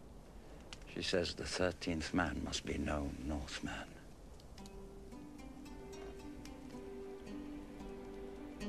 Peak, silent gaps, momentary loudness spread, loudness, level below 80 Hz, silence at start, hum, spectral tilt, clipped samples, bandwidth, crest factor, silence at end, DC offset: -20 dBFS; none; 17 LU; -42 LUFS; -54 dBFS; 0 s; none; -4.5 dB/octave; under 0.1%; 14 kHz; 24 dB; 0 s; under 0.1%